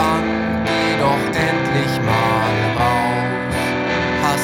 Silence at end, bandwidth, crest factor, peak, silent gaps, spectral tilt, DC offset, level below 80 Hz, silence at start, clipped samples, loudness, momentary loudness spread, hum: 0 s; 17.5 kHz; 14 dB; -4 dBFS; none; -5.5 dB/octave; under 0.1%; -42 dBFS; 0 s; under 0.1%; -18 LUFS; 3 LU; none